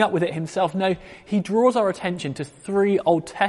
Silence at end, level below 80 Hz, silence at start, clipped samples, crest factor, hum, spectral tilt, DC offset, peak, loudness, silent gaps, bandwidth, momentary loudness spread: 0 s; -58 dBFS; 0 s; under 0.1%; 16 dB; none; -6 dB/octave; under 0.1%; -6 dBFS; -22 LUFS; none; 11.5 kHz; 10 LU